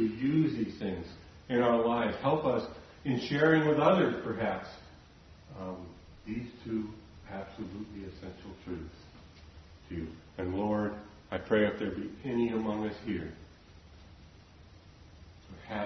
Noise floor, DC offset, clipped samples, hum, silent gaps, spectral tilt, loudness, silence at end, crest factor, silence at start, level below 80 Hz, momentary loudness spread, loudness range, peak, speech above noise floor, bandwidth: -55 dBFS; under 0.1%; under 0.1%; none; none; -7.5 dB/octave; -32 LUFS; 0 s; 22 dB; 0 s; -58 dBFS; 21 LU; 14 LU; -12 dBFS; 24 dB; 6.4 kHz